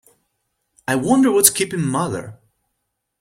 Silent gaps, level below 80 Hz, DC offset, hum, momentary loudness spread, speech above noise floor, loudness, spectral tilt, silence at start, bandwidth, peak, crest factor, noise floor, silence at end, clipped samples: none; -58 dBFS; under 0.1%; none; 15 LU; 58 dB; -17 LUFS; -3.5 dB/octave; 0.9 s; 16.5 kHz; 0 dBFS; 20 dB; -75 dBFS; 0.85 s; under 0.1%